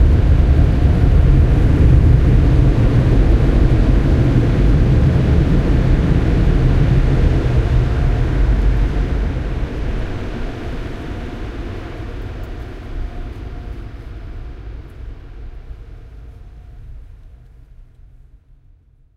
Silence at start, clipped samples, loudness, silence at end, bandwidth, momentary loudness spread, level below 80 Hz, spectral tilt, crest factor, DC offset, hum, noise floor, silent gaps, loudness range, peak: 0 s; under 0.1%; -15 LUFS; 1.9 s; 6.8 kHz; 20 LU; -18 dBFS; -9 dB/octave; 14 dB; under 0.1%; none; -49 dBFS; none; 20 LU; 0 dBFS